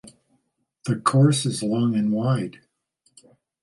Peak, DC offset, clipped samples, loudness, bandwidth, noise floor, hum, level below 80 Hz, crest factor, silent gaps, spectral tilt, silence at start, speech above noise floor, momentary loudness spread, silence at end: -6 dBFS; under 0.1%; under 0.1%; -22 LUFS; 11.5 kHz; -71 dBFS; none; -64 dBFS; 18 dB; none; -6 dB/octave; 0.05 s; 50 dB; 11 LU; 1.1 s